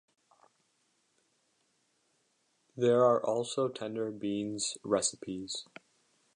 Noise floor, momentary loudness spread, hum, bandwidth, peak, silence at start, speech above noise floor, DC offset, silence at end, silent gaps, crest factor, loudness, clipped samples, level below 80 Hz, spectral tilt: -75 dBFS; 14 LU; none; 11 kHz; -14 dBFS; 2.75 s; 44 dB; under 0.1%; 0.7 s; none; 20 dB; -32 LUFS; under 0.1%; -76 dBFS; -4 dB/octave